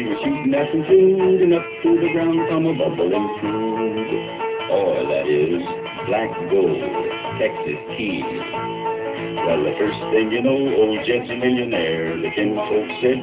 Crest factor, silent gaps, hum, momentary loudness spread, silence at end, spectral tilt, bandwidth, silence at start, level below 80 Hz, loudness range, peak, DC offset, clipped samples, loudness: 16 dB; none; none; 9 LU; 0 s; -10.5 dB/octave; 4 kHz; 0 s; -54 dBFS; 5 LU; -4 dBFS; under 0.1%; under 0.1%; -20 LUFS